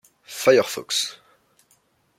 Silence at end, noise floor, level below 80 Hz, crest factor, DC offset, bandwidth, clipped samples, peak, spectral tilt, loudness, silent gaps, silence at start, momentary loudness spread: 1.05 s; -64 dBFS; -72 dBFS; 22 dB; under 0.1%; 16.5 kHz; under 0.1%; -4 dBFS; -2.5 dB/octave; -21 LUFS; none; 0.3 s; 12 LU